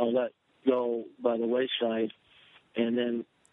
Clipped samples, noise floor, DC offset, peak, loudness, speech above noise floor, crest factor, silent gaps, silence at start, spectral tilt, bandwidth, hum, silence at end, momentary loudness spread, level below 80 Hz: under 0.1%; -60 dBFS; under 0.1%; -12 dBFS; -30 LUFS; 31 dB; 18 dB; none; 0 s; -7 dB/octave; 3.9 kHz; none; 0.3 s; 8 LU; -82 dBFS